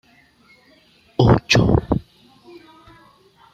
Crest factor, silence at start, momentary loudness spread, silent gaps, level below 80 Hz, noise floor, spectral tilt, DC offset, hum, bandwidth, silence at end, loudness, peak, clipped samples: 20 dB; 1.2 s; 11 LU; none; -36 dBFS; -54 dBFS; -6 dB/octave; under 0.1%; none; 13 kHz; 1.55 s; -17 LUFS; -2 dBFS; under 0.1%